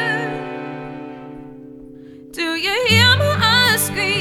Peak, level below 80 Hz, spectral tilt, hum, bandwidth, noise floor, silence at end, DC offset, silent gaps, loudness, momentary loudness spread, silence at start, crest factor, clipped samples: -2 dBFS; -50 dBFS; -3.5 dB/octave; none; 17 kHz; -39 dBFS; 0 s; under 0.1%; none; -15 LUFS; 23 LU; 0 s; 18 dB; under 0.1%